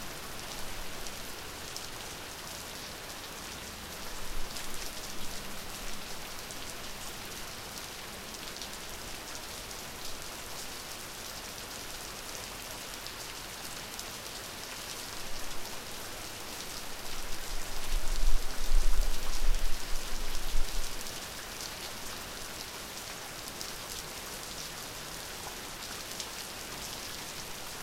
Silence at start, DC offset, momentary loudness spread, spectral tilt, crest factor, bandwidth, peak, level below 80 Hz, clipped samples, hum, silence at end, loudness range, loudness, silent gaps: 0 s; under 0.1%; 4 LU; -2 dB/octave; 20 dB; 16.5 kHz; -12 dBFS; -36 dBFS; under 0.1%; none; 0 s; 4 LU; -39 LUFS; none